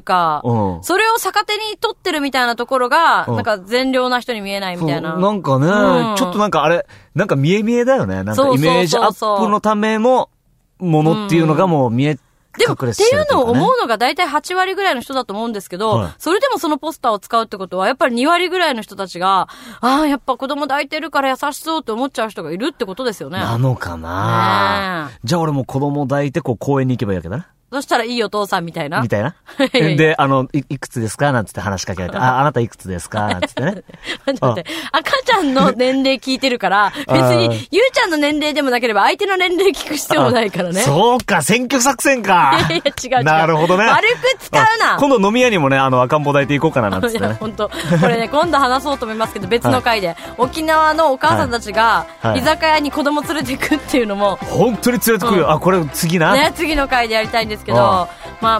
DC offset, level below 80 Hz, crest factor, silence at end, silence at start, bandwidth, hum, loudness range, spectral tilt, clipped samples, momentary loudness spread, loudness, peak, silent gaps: under 0.1%; -44 dBFS; 14 dB; 0 s; 0.05 s; 16 kHz; none; 5 LU; -5 dB/octave; under 0.1%; 9 LU; -16 LUFS; -2 dBFS; none